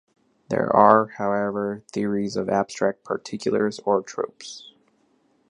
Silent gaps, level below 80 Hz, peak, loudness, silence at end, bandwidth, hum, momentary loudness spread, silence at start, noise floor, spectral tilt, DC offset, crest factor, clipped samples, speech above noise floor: none; -64 dBFS; -2 dBFS; -23 LUFS; 0.9 s; 10.5 kHz; none; 14 LU; 0.5 s; -64 dBFS; -6 dB/octave; under 0.1%; 22 dB; under 0.1%; 42 dB